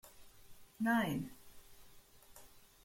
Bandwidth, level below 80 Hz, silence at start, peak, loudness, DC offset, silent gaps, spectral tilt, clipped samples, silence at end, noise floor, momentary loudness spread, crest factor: 16.5 kHz; -66 dBFS; 0.05 s; -22 dBFS; -37 LUFS; under 0.1%; none; -5.5 dB/octave; under 0.1%; 0.25 s; -60 dBFS; 27 LU; 20 dB